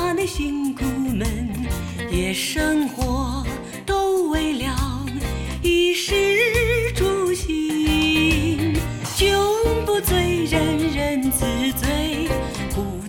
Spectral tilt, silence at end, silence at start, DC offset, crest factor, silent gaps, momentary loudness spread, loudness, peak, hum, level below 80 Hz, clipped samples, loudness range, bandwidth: -4.5 dB/octave; 0 s; 0 s; under 0.1%; 14 dB; none; 8 LU; -21 LUFS; -6 dBFS; none; -30 dBFS; under 0.1%; 4 LU; 17.5 kHz